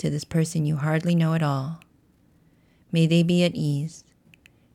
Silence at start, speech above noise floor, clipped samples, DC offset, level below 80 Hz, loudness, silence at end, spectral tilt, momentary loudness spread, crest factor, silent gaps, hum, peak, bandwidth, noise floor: 0 s; 38 dB; under 0.1%; under 0.1%; -60 dBFS; -23 LUFS; 0.75 s; -6.5 dB/octave; 10 LU; 16 dB; none; none; -10 dBFS; 12.5 kHz; -60 dBFS